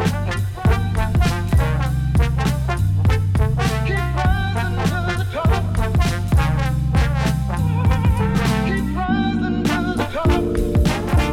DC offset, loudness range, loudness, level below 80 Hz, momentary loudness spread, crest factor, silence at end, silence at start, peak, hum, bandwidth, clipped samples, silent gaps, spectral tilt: under 0.1%; 1 LU; -19 LUFS; -24 dBFS; 3 LU; 14 dB; 0 s; 0 s; -4 dBFS; none; 16 kHz; under 0.1%; none; -6.5 dB/octave